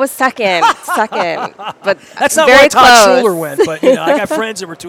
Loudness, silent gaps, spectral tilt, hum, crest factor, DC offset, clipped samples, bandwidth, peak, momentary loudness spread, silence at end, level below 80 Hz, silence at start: -10 LUFS; none; -2.5 dB/octave; none; 10 dB; under 0.1%; 1%; over 20 kHz; 0 dBFS; 13 LU; 0 s; -46 dBFS; 0 s